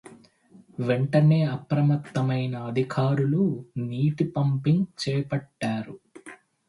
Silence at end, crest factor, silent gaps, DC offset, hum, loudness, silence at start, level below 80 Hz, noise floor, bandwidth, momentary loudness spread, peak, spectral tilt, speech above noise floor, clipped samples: 0.35 s; 16 dB; none; under 0.1%; none; -25 LUFS; 0.05 s; -64 dBFS; -54 dBFS; 11.5 kHz; 12 LU; -8 dBFS; -8 dB/octave; 30 dB; under 0.1%